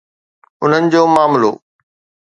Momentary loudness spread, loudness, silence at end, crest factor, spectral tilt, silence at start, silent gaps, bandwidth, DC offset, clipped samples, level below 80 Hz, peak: 8 LU; -13 LUFS; 0.7 s; 14 dB; -6 dB/octave; 0.6 s; none; 11 kHz; under 0.1%; under 0.1%; -62 dBFS; 0 dBFS